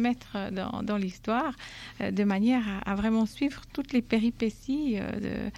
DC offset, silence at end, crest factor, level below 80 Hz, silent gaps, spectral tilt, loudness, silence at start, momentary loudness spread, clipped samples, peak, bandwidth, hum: under 0.1%; 0 s; 16 dB; -50 dBFS; none; -6.5 dB/octave; -29 LUFS; 0 s; 8 LU; under 0.1%; -14 dBFS; 12.5 kHz; none